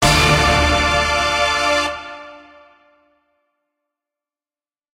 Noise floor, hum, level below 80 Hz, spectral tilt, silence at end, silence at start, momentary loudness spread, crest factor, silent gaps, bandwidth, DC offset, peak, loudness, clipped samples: under -90 dBFS; none; -30 dBFS; -3.5 dB/octave; 2.55 s; 0 s; 17 LU; 18 dB; none; 16 kHz; under 0.1%; -2 dBFS; -15 LUFS; under 0.1%